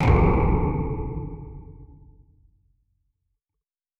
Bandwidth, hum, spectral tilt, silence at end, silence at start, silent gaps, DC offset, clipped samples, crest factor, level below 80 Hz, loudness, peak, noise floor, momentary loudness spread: 6.6 kHz; none; -9.5 dB/octave; 2.15 s; 0 s; none; under 0.1%; under 0.1%; 18 dB; -30 dBFS; -23 LUFS; -8 dBFS; -86 dBFS; 24 LU